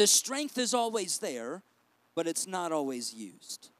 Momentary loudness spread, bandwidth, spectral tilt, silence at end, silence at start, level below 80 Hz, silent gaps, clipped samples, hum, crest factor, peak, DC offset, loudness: 15 LU; 16 kHz; -1.5 dB/octave; 0.15 s; 0 s; under -90 dBFS; none; under 0.1%; none; 22 dB; -10 dBFS; under 0.1%; -31 LUFS